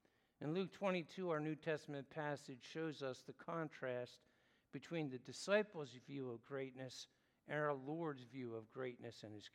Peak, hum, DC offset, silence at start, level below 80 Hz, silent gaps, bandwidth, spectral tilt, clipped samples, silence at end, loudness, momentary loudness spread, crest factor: -26 dBFS; none; under 0.1%; 0.4 s; under -90 dBFS; none; 13 kHz; -5.5 dB/octave; under 0.1%; 0.05 s; -46 LUFS; 11 LU; 20 dB